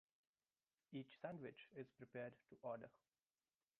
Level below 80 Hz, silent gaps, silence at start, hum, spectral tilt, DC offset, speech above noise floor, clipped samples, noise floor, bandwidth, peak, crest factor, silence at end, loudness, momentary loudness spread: under -90 dBFS; none; 0.9 s; none; -5.5 dB/octave; under 0.1%; over 35 dB; under 0.1%; under -90 dBFS; 4.3 kHz; -38 dBFS; 20 dB; 0.9 s; -56 LUFS; 6 LU